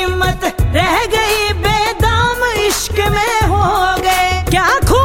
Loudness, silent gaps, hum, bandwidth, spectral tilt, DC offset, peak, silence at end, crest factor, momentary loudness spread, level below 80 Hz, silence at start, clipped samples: -13 LUFS; none; none; 17 kHz; -4 dB/octave; under 0.1%; -2 dBFS; 0 s; 12 dB; 2 LU; -22 dBFS; 0 s; under 0.1%